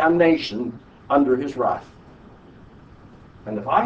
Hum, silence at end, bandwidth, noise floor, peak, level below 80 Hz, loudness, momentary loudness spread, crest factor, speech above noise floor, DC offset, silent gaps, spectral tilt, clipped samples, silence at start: none; 0 s; 8 kHz; -46 dBFS; -4 dBFS; -54 dBFS; -22 LUFS; 14 LU; 20 dB; 26 dB; under 0.1%; none; -7 dB/octave; under 0.1%; 0 s